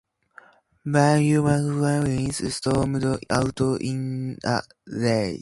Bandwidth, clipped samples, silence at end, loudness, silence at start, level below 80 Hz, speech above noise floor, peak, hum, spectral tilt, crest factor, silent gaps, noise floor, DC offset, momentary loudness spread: 11.5 kHz; under 0.1%; 0 s; -23 LUFS; 0.85 s; -48 dBFS; 30 dB; -4 dBFS; none; -6 dB/octave; 18 dB; none; -52 dBFS; under 0.1%; 9 LU